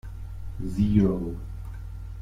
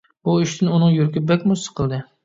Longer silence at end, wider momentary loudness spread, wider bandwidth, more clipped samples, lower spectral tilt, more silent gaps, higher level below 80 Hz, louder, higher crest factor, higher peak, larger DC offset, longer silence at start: second, 0 s vs 0.2 s; first, 18 LU vs 8 LU; first, 10.5 kHz vs 7.8 kHz; neither; first, -9.5 dB/octave vs -6.5 dB/octave; neither; first, -36 dBFS vs -50 dBFS; second, -26 LUFS vs -19 LUFS; first, 20 dB vs 14 dB; second, -8 dBFS vs -4 dBFS; neither; second, 0.05 s vs 0.25 s